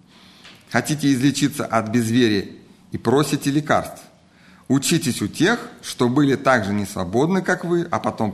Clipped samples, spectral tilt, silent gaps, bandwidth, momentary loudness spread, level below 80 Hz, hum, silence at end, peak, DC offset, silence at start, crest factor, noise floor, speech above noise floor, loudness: under 0.1%; -5 dB/octave; none; 13 kHz; 7 LU; -56 dBFS; none; 0 s; -2 dBFS; under 0.1%; 0.45 s; 18 dB; -50 dBFS; 31 dB; -20 LUFS